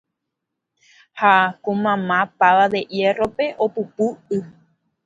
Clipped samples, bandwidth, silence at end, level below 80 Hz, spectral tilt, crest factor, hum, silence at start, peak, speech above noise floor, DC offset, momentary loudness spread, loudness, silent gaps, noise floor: under 0.1%; 7.8 kHz; 0.55 s; -62 dBFS; -6 dB/octave; 20 dB; none; 1.15 s; 0 dBFS; 62 dB; under 0.1%; 9 LU; -19 LUFS; none; -80 dBFS